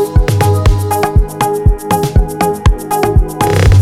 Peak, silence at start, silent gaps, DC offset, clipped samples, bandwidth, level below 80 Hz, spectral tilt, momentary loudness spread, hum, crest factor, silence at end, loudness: 0 dBFS; 0 s; none; under 0.1%; under 0.1%; 16 kHz; -14 dBFS; -6 dB/octave; 3 LU; none; 10 dB; 0 s; -12 LUFS